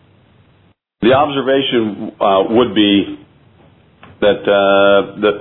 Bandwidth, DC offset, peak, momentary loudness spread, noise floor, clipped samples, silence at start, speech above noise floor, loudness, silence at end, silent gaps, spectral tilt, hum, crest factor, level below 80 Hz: 4.1 kHz; under 0.1%; 0 dBFS; 7 LU; -54 dBFS; under 0.1%; 1 s; 41 dB; -13 LUFS; 0 s; none; -9 dB/octave; none; 14 dB; -50 dBFS